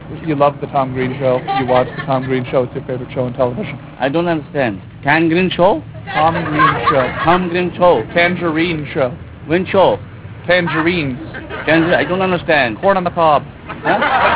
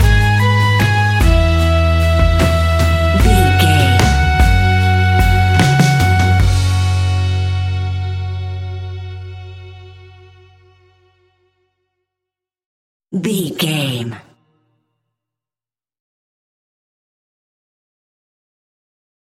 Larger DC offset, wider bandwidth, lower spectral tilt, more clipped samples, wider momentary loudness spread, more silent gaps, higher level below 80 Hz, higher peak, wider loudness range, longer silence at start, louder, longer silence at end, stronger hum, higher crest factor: neither; second, 4 kHz vs 16 kHz; first, -10 dB/octave vs -5.5 dB/octave; neither; second, 9 LU vs 14 LU; second, none vs 12.66-13.00 s; second, -42 dBFS vs -22 dBFS; about the same, 0 dBFS vs 0 dBFS; second, 4 LU vs 16 LU; about the same, 0 s vs 0 s; about the same, -15 LUFS vs -14 LUFS; second, 0 s vs 5 s; neither; about the same, 16 dB vs 14 dB